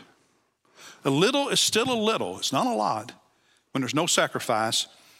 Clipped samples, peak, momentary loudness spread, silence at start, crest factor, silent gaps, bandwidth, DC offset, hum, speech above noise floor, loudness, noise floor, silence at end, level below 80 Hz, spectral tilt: under 0.1%; -6 dBFS; 10 LU; 0 s; 20 dB; none; 16.5 kHz; under 0.1%; none; 42 dB; -24 LUFS; -67 dBFS; 0.35 s; -74 dBFS; -3 dB/octave